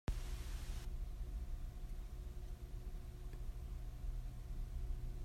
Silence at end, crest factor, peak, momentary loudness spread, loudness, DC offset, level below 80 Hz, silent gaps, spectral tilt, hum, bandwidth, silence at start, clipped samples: 0 s; 14 dB; -30 dBFS; 4 LU; -50 LUFS; under 0.1%; -46 dBFS; none; -5.5 dB/octave; none; 15.5 kHz; 0.1 s; under 0.1%